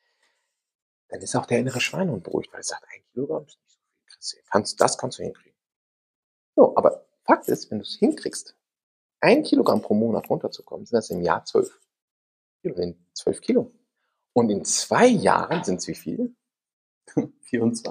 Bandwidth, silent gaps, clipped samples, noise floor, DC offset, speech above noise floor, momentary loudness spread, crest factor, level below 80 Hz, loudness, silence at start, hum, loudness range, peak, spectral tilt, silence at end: 15 kHz; 5.76-6.53 s, 8.83-9.10 s, 12.02-12.59 s, 16.73-17.01 s; under 0.1%; -77 dBFS; under 0.1%; 54 dB; 15 LU; 22 dB; -66 dBFS; -23 LUFS; 1.1 s; none; 6 LU; -2 dBFS; -4.5 dB/octave; 0 s